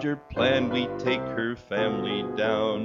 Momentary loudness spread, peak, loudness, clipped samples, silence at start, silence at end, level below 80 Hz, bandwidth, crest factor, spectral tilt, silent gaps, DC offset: 6 LU; -10 dBFS; -27 LUFS; under 0.1%; 0 s; 0 s; -54 dBFS; 7.2 kHz; 16 dB; -6.5 dB/octave; none; under 0.1%